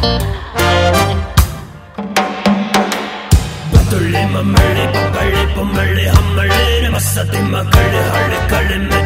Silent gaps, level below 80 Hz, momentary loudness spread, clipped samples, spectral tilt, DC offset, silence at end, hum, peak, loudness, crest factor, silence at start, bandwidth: none; -20 dBFS; 6 LU; 0.2%; -5 dB/octave; under 0.1%; 0 s; none; 0 dBFS; -13 LUFS; 12 dB; 0 s; 16.5 kHz